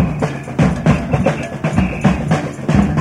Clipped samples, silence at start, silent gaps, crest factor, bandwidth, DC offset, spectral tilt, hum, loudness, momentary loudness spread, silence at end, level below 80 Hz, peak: under 0.1%; 0 s; none; 16 dB; 11.5 kHz; under 0.1%; -7.5 dB/octave; none; -17 LUFS; 5 LU; 0 s; -28 dBFS; 0 dBFS